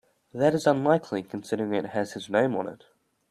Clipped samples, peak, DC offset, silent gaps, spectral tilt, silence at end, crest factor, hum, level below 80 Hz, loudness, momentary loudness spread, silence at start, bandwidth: under 0.1%; -6 dBFS; under 0.1%; none; -6.5 dB/octave; 0.55 s; 20 dB; none; -68 dBFS; -26 LUFS; 11 LU; 0.35 s; 14 kHz